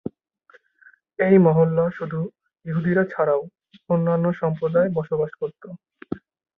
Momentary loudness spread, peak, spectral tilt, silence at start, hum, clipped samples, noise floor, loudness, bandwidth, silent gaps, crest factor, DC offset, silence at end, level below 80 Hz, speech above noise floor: 20 LU; -4 dBFS; -11.5 dB/octave; 1.2 s; none; under 0.1%; -56 dBFS; -21 LUFS; 3.9 kHz; none; 18 dB; under 0.1%; 0.4 s; -62 dBFS; 36 dB